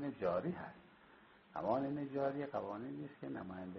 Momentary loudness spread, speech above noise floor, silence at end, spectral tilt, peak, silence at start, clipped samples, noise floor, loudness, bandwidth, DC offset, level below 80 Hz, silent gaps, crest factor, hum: 11 LU; 23 dB; 0 s; -7 dB/octave; -24 dBFS; 0 s; under 0.1%; -64 dBFS; -42 LUFS; 5.8 kHz; under 0.1%; -76 dBFS; none; 18 dB; none